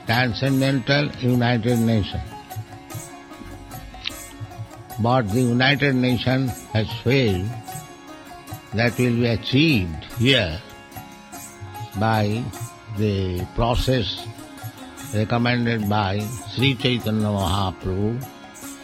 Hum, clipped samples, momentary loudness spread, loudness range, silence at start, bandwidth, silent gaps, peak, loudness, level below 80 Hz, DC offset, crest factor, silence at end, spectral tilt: none; under 0.1%; 19 LU; 5 LU; 0 s; 16 kHz; none; -2 dBFS; -21 LUFS; -42 dBFS; under 0.1%; 20 dB; 0 s; -6 dB/octave